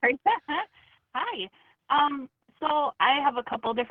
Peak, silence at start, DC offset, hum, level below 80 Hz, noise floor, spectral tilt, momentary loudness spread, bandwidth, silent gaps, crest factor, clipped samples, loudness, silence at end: -8 dBFS; 0 s; under 0.1%; none; -68 dBFS; -59 dBFS; -6 dB/octave; 14 LU; 4.6 kHz; none; 18 dB; under 0.1%; -27 LUFS; 0.05 s